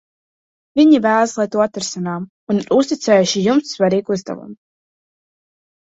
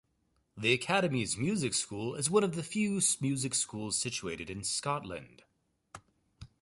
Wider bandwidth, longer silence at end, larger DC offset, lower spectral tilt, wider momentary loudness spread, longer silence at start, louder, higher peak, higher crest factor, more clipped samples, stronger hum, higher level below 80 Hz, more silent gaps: second, 8 kHz vs 12 kHz; first, 1.3 s vs 0.15 s; neither; first, -5 dB/octave vs -3.5 dB/octave; first, 12 LU vs 9 LU; first, 0.75 s vs 0.55 s; first, -16 LUFS vs -31 LUFS; first, -2 dBFS vs -12 dBFS; second, 16 dB vs 22 dB; neither; neither; about the same, -60 dBFS vs -64 dBFS; first, 2.30-2.47 s vs none